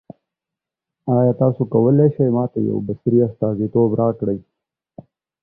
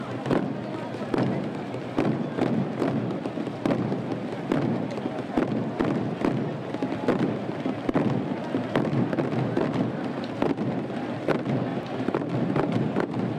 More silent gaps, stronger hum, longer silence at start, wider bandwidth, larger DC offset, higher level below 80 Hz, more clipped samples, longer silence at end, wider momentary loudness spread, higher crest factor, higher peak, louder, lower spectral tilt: neither; neither; first, 1.05 s vs 0 s; second, 2 kHz vs 10.5 kHz; neither; about the same, -54 dBFS vs -56 dBFS; neither; first, 1 s vs 0 s; first, 8 LU vs 5 LU; about the same, 16 dB vs 14 dB; first, -4 dBFS vs -12 dBFS; first, -18 LUFS vs -28 LUFS; first, -15 dB/octave vs -8 dB/octave